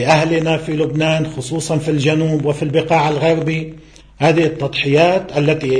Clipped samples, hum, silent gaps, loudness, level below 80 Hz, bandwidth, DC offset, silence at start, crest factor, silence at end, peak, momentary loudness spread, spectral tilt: under 0.1%; none; none; -16 LUFS; -46 dBFS; 10.5 kHz; under 0.1%; 0 s; 16 dB; 0 s; 0 dBFS; 6 LU; -6 dB/octave